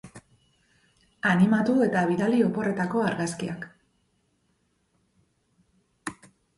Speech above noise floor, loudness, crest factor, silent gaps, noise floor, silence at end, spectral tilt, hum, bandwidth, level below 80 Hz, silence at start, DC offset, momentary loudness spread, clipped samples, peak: 47 dB; -24 LUFS; 18 dB; none; -71 dBFS; 0.45 s; -6.5 dB/octave; none; 11.5 kHz; -64 dBFS; 0.05 s; under 0.1%; 18 LU; under 0.1%; -10 dBFS